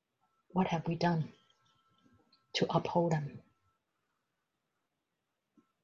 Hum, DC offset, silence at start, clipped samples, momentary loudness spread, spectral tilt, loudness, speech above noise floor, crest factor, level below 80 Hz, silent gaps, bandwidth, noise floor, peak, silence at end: none; under 0.1%; 0.55 s; under 0.1%; 8 LU; -6.5 dB/octave; -34 LUFS; 53 dB; 22 dB; -70 dBFS; none; 7.4 kHz; -86 dBFS; -16 dBFS; 2.45 s